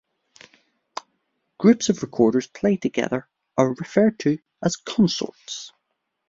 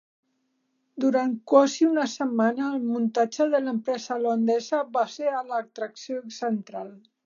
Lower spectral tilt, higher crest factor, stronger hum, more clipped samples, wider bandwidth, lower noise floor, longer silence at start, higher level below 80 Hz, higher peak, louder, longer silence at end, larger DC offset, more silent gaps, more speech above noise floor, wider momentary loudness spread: about the same, -5.5 dB/octave vs -5 dB/octave; about the same, 22 dB vs 20 dB; neither; neither; about the same, 7.8 kHz vs 7.4 kHz; about the same, -77 dBFS vs -74 dBFS; first, 1.6 s vs 0.95 s; first, -62 dBFS vs -84 dBFS; first, -2 dBFS vs -6 dBFS; first, -22 LUFS vs -25 LUFS; first, 0.6 s vs 0.25 s; neither; neither; first, 55 dB vs 49 dB; about the same, 16 LU vs 14 LU